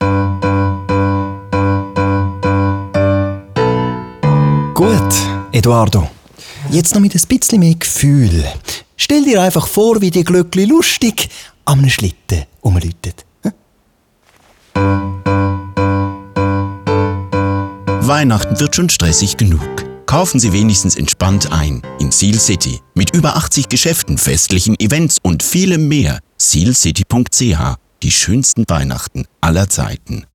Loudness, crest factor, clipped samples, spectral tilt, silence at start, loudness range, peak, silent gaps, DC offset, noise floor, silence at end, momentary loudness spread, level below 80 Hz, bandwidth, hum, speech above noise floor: -13 LUFS; 12 dB; under 0.1%; -4.5 dB/octave; 0 s; 6 LU; -2 dBFS; none; under 0.1%; -56 dBFS; 0.15 s; 9 LU; -32 dBFS; 19.5 kHz; none; 44 dB